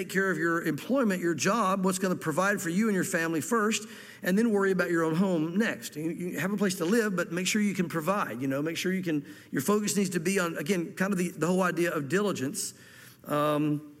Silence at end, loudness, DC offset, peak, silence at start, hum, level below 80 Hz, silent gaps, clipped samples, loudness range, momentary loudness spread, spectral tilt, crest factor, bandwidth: 0.05 s; -28 LUFS; under 0.1%; -12 dBFS; 0 s; none; -74 dBFS; none; under 0.1%; 2 LU; 6 LU; -5 dB/octave; 16 dB; 16.5 kHz